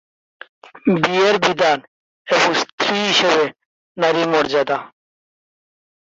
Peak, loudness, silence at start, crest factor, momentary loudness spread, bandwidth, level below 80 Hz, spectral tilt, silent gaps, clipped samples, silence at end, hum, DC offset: 0 dBFS; -17 LUFS; 0.75 s; 18 dB; 8 LU; 8 kHz; -62 dBFS; -3.5 dB/octave; 1.87-2.25 s, 2.72-2.78 s, 3.66-3.95 s; under 0.1%; 1.25 s; none; under 0.1%